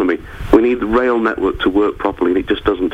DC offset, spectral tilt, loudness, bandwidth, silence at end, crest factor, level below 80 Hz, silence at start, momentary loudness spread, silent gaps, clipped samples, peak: under 0.1%; -7 dB/octave; -16 LUFS; 8.2 kHz; 0 s; 16 dB; -32 dBFS; 0 s; 5 LU; none; 0.1%; 0 dBFS